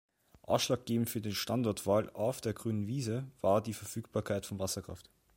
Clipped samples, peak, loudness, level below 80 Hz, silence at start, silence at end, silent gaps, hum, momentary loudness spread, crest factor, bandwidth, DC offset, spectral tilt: under 0.1%; -14 dBFS; -34 LUFS; -64 dBFS; 0.5 s; 0.35 s; none; none; 8 LU; 20 dB; 16.5 kHz; under 0.1%; -5 dB/octave